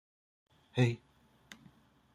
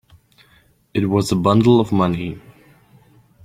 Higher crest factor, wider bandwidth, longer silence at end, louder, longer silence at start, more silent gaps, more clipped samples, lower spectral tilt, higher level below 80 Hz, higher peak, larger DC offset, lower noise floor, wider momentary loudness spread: about the same, 22 dB vs 18 dB; second, 11 kHz vs 15.5 kHz; first, 1.2 s vs 1.05 s; second, -34 LUFS vs -17 LUFS; second, 0.75 s vs 0.95 s; neither; neither; about the same, -7 dB/octave vs -7 dB/octave; second, -72 dBFS vs -50 dBFS; second, -16 dBFS vs -2 dBFS; neither; first, -64 dBFS vs -55 dBFS; first, 24 LU vs 14 LU